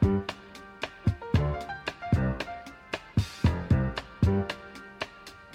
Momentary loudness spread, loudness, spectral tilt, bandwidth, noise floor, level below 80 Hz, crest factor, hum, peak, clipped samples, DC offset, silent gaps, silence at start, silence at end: 13 LU; -30 LUFS; -7 dB/octave; 12 kHz; -48 dBFS; -40 dBFS; 18 dB; none; -12 dBFS; under 0.1%; under 0.1%; none; 0 s; 0 s